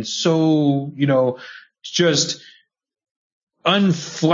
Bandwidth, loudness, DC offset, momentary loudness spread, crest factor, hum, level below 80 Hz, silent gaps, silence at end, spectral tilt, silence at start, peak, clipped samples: 7.6 kHz; -18 LUFS; under 0.1%; 14 LU; 16 dB; none; -68 dBFS; 3.11-3.47 s; 0 s; -4.5 dB/octave; 0 s; -4 dBFS; under 0.1%